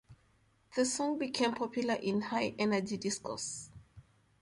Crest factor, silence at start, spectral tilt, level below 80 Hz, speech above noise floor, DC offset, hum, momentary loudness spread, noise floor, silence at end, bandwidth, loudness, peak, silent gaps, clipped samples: 18 dB; 0.1 s; -3.5 dB/octave; -70 dBFS; 36 dB; under 0.1%; none; 8 LU; -70 dBFS; 0.4 s; 11.5 kHz; -34 LUFS; -18 dBFS; none; under 0.1%